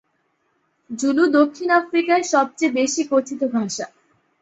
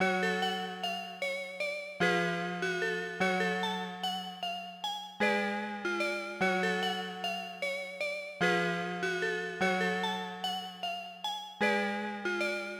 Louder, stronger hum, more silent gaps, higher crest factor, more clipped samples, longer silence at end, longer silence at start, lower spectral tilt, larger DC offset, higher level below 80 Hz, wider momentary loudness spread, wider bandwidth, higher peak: first, -19 LUFS vs -33 LUFS; neither; neither; about the same, 18 dB vs 18 dB; neither; first, 0.55 s vs 0 s; first, 0.9 s vs 0 s; about the same, -3.5 dB/octave vs -4 dB/octave; neither; first, -68 dBFS vs -76 dBFS; about the same, 10 LU vs 8 LU; second, 8.2 kHz vs over 20 kHz; first, -4 dBFS vs -16 dBFS